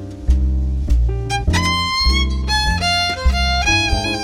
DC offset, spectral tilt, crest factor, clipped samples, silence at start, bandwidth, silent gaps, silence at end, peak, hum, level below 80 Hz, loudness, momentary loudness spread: under 0.1%; -4 dB/octave; 12 dB; under 0.1%; 0 s; 13.5 kHz; none; 0 s; -4 dBFS; none; -20 dBFS; -17 LUFS; 5 LU